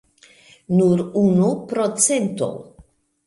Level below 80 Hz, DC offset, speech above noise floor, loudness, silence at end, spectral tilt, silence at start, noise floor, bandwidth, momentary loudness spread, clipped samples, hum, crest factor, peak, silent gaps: -58 dBFS; under 0.1%; 34 dB; -19 LUFS; 0.65 s; -5.5 dB/octave; 0.7 s; -52 dBFS; 11.5 kHz; 9 LU; under 0.1%; none; 20 dB; -2 dBFS; none